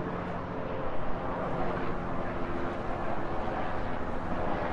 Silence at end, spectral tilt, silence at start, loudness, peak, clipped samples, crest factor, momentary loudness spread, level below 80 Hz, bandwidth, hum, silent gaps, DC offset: 0 s; -8 dB/octave; 0 s; -34 LUFS; -18 dBFS; under 0.1%; 12 dB; 3 LU; -42 dBFS; 6.8 kHz; none; none; under 0.1%